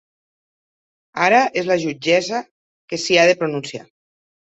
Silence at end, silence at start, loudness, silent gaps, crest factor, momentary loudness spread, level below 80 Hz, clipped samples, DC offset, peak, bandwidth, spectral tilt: 0.7 s; 1.15 s; -18 LUFS; 2.51-2.88 s; 18 dB; 16 LU; -66 dBFS; under 0.1%; under 0.1%; -2 dBFS; 8.2 kHz; -3.5 dB/octave